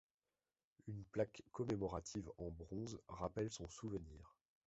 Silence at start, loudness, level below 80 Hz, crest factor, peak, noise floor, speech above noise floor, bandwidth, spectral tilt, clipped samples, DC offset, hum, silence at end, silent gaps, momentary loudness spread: 0.85 s; -47 LUFS; -64 dBFS; 22 dB; -26 dBFS; under -90 dBFS; over 44 dB; 8 kHz; -7 dB/octave; under 0.1%; under 0.1%; none; 0.4 s; none; 10 LU